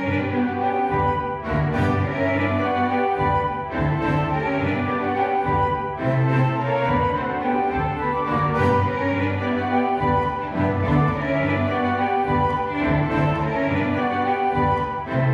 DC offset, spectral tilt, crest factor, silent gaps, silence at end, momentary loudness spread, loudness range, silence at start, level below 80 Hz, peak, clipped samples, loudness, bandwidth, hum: under 0.1%; -8.5 dB/octave; 16 dB; none; 0 s; 3 LU; 1 LU; 0 s; -40 dBFS; -6 dBFS; under 0.1%; -22 LUFS; 7.4 kHz; none